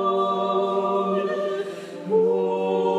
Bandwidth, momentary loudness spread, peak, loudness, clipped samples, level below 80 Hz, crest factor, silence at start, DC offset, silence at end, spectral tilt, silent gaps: 10 kHz; 8 LU; -10 dBFS; -23 LUFS; under 0.1%; -84 dBFS; 12 dB; 0 s; under 0.1%; 0 s; -7 dB/octave; none